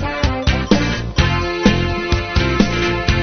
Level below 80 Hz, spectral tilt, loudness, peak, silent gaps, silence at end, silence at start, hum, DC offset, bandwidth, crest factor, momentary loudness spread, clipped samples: -24 dBFS; -4.5 dB/octave; -17 LUFS; 0 dBFS; none; 0 s; 0 s; none; under 0.1%; 6.6 kHz; 16 dB; 3 LU; under 0.1%